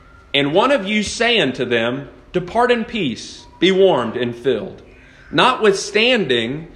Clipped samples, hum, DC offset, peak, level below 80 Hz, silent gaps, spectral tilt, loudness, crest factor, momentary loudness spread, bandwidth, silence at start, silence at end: under 0.1%; none; under 0.1%; 0 dBFS; -48 dBFS; none; -4 dB/octave; -17 LUFS; 18 dB; 10 LU; 10.5 kHz; 0.35 s; 0 s